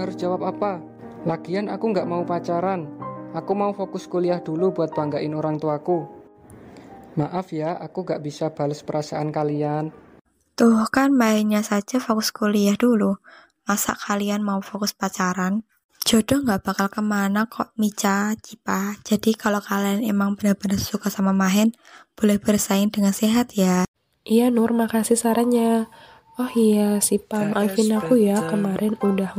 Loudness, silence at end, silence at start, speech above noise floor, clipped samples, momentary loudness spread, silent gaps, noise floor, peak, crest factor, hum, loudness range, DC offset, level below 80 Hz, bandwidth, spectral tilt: -22 LUFS; 0 s; 0 s; 24 dB; under 0.1%; 9 LU; 15.84-15.89 s, 23.88-23.94 s; -45 dBFS; -6 dBFS; 16 dB; none; 6 LU; under 0.1%; -58 dBFS; 16 kHz; -5 dB/octave